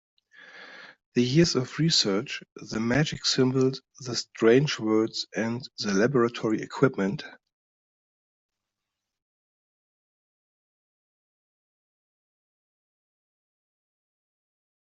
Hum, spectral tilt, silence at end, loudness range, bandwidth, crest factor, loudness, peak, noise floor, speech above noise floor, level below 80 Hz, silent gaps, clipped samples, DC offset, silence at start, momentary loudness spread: none; -5 dB/octave; 7.55 s; 7 LU; 8.2 kHz; 24 dB; -25 LUFS; -6 dBFS; -86 dBFS; 61 dB; -64 dBFS; 1.06-1.12 s, 2.52-2.56 s; under 0.1%; under 0.1%; 0.55 s; 15 LU